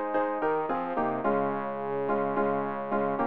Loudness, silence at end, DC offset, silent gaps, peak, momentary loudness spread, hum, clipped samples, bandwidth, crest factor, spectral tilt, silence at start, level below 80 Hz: -29 LUFS; 0 s; 0.4%; none; -14 dBFS; 3 LU; none; under 0.1%; 4.7 kHz; 14 dB; -10 dB/octave; 0 s; -64 dBFS